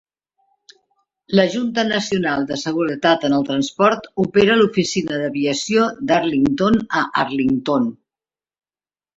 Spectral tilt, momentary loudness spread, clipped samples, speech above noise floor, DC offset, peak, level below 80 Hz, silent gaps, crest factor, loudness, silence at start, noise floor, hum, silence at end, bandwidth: -5 dB/octave; 6 LU; under 0.1%; over 72 dB; under 0.1%; -2 dBFS; -52 dBFS; none; 18 dB; -18 LUFS; 1.3 s; under -90 dBFS; none; 1.25 s; 8 kHz